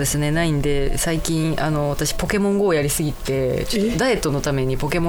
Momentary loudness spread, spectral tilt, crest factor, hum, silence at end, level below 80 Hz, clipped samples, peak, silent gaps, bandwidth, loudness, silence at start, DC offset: 3 LU; -5 dB/octave; 16 dB; none; 0 s; -30 dBFS; under 0.1%; -2 dBFS; none; over 20 kHz; -21 LUFS; 0 s; under 0.1%